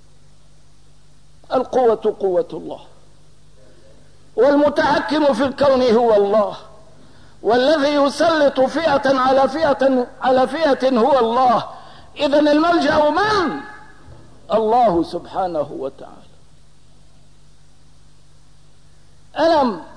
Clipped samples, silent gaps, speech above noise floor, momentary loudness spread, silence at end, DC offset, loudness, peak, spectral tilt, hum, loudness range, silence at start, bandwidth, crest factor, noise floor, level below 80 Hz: under 0.1%; none; 35 dB; 12 LU; 0.1 s; 0.8%; -17 LUFS; -6 dBFS; -5 dB/octave; 50 Hz at -55 dBFS; 6 LU; 1.5 s; 10.5 kHz; 12 dB; -52 dBFS; -50 dBFS